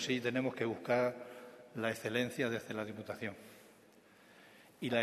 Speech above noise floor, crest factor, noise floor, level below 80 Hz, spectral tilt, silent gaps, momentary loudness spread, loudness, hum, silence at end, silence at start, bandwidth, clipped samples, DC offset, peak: 26 dB; 22 dB; -63 dBFS; -80 dBFS; -5 dB/octave; none; 18 LU; -37 LUFS; none; 0 s; 0 s; 13.5 kHz; under 0.1%; under 0.1%; -18 dBFS